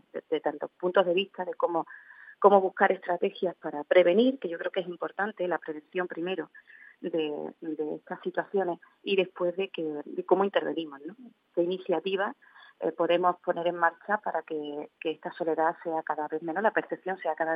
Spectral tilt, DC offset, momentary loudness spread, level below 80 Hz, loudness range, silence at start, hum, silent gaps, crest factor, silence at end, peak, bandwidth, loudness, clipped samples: -8.5 dB/octave; under 0.1%; 11 LU; under -90 dBFS; 8 LU; 0.15 s; none; none; 24 dB; 0 s; -6 dBFS; 5.2 kHz; -29 LUFS; under 0.1%